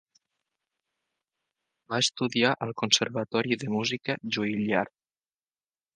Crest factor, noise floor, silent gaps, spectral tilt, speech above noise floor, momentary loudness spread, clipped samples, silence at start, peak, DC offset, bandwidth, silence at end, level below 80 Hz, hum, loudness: 24 dB; under -90 dBFS; none; -3.5 dB/octave; over 62 dB; 7 LU; under 0.1%; 1.9 s; -6 dBFS; under 0.1%; 10 kHz; 1.1 s; -70 dBFS; none; -27 LUFS